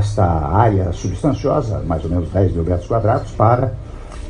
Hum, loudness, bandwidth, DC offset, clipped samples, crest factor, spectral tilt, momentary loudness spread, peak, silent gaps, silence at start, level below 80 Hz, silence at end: none; -18 LUFS; 9.8 kHz; under 0.1%; under 0.1%; 16 dB; -8.5 dB/octave; 7 LU; 0 dBFS; none; 0 s; -30 dBFS; 0 s